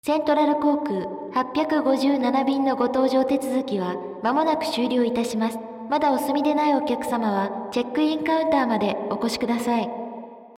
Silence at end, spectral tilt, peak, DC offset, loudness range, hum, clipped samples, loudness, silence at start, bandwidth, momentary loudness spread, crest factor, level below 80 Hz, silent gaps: 0.05 s; -5 dB/octave; -8 dBFS; under 0.1%; 2 LU; none; under 0.1%; -23 LUFS; 0.05 s; 16 kHz; 7 LU; 14 dB; -62 dBFS; none